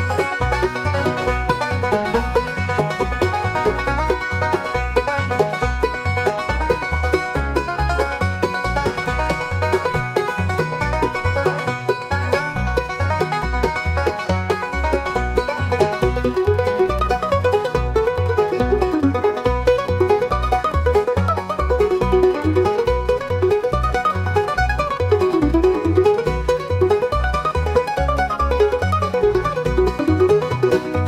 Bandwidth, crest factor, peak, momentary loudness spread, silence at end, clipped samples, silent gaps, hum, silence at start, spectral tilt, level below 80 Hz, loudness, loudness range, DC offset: 15 kHz; 16 dB; -2 dBFS; 4 LU; 0 s; under 0.1%; none; none; 0 s; -6.5 dB/octave; -28 dBFS; -19 LUFS; 3 LU; under 0.1%